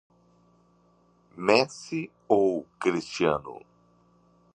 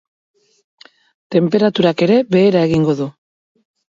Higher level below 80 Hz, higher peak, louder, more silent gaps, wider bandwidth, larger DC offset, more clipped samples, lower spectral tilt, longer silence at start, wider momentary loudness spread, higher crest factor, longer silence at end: second, -64 dBFS vs -54 dBFS; second, -6 dBFS vs 0 dBFS; second, -26 LUFS vs -15 LUFS; neither; first, 10 kHz vs 7.6 kHz; neither; neither; second, -5 dB/octave vs -7.5 dB/octave; about the same, 1.35 s vs 1.3 s; first, 12 LU vs 7 LU; first, 24 dB vs 16 dB; first, 1 s vs 0.85 s